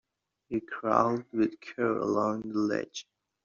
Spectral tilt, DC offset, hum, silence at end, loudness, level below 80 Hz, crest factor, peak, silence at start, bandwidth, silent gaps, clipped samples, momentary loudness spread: -5 dB/octave; under 0.1%; none; 0.45 s; -30 LUFS; -70 dBFS; 24 dB; -8 dBFS; 0.5 s; 7.4 kHz; none; under 0.1%; 10 LU